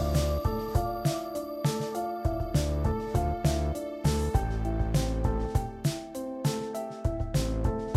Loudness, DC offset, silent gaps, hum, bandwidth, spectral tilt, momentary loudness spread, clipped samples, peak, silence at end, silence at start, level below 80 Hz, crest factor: -30 LUFS; under 0.1%; none; none; 15.5 kHz; -6.5 dB/octave; 5 LU; under 0.1%; -12 dBFS; 0 s; 0 s; -34 dBFS; 16 dB